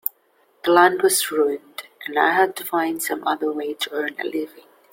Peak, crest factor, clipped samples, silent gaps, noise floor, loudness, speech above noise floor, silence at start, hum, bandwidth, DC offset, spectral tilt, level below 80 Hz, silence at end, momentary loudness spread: -2 dBFS; 20 dB; under 0.1%; none; -61 dBFS; -21 LUFS; 40 dB; 0.65 s; none; 16.5 kHz; under 0.1%; -2 dB/octave; -70 dBFS; 0.3 s; 14 LU